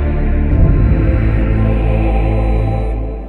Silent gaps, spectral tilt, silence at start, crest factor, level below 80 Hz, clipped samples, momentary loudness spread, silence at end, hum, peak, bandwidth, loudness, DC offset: none; -10.5 dB/octave; 0 s; 10 dB; -14 dBFS; under 0.1%; 4 LU; 0 s; none; -2 dBFS; 4.2 kHz; -15 LUFS; under 0.1%